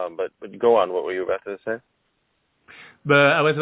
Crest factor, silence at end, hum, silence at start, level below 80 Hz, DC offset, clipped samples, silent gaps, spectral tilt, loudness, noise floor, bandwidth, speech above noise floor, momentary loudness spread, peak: 20 dB; 0 s; none; 0 s; -66 dBFS; under 0.1%; under 0.1%; none; -9.5 dB/octave; -21 LUFS; -70 dBFS; 4 kHz; 49 dB; 15 LU; -2 dBFS